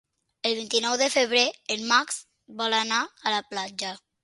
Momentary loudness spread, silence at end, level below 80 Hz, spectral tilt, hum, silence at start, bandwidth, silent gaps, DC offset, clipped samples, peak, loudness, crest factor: 12 LU; 0.25 s; -74 dBFS; -0.5 dB/octave; none; 0.45 s; 11.5 kHz; none; under 0.1%; under 0.1%; -6 dBFS; -25 LUFS; 22 dB